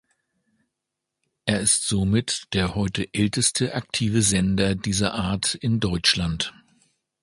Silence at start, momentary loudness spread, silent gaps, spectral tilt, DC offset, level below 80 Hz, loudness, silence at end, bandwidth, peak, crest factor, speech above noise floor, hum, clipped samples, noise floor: 1.45 s; 6 LU; none; -3.5 dB/octave; under 0.1%; -44 dBFS; -22 LUFS; 0.7 s; 11.5 kHz; -2 dBFS; 22 dB; 60 dB; none; under 0.1%; -83 dBFS